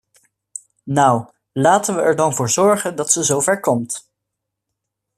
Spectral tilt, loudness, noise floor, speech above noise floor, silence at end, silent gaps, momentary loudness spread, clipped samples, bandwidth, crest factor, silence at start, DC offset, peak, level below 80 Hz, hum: -4 dB/octave; -17 LUFS; -79 dBFS; 63 dB; 1.2 s; none; 15 LU; under 0.1%; 14.5 kHz; 18 dB; 0.85 s; under 0.1%; 0 dBFS; -60 dBFS; none